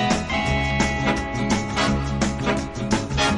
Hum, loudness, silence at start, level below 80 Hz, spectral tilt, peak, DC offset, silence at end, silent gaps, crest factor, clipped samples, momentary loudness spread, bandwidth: none; -22 LUFS; 0 s; -32 dBFS; -4.5 dB/octave; -6 dBFS; under 0.1%; 0 s; none; 16 dB; under 0.1%; 3 LU; 11.5 kHz